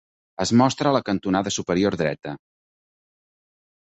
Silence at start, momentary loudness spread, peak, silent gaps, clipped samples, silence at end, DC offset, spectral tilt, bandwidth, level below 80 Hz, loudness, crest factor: 0.4 s; 17 LU; -4 dBFS; none; under 0.1%; 1.5 s; under 0.1%; -5 dB/octave; 8.2 kHz; -54 dBFS; -22 LUFS; 20 dB